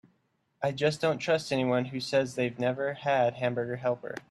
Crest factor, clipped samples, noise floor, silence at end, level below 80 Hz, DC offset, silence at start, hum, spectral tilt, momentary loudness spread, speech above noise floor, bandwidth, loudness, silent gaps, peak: 16 dB; under 0.1%; -74 dBFS; 0.1 s; -70 dBFS; under 0.1%; 0.6 s; none; -5.5 dB/octave; 5 LU; 45 dB; 13 kHz; -29 LUFS; none; -12 dBFS